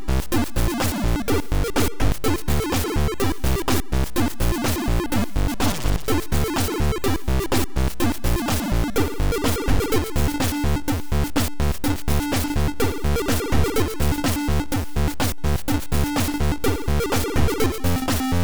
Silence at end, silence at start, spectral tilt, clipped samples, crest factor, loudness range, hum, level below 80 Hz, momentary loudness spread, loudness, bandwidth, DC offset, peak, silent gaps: 0 s; 0 s; -5 dB/octave; under 0.1%; 12 dB; 1 LU; none; -26 dBFS; 2 LU; -23 LUFS; over 20 kHz; 2%; -8 dBFS; none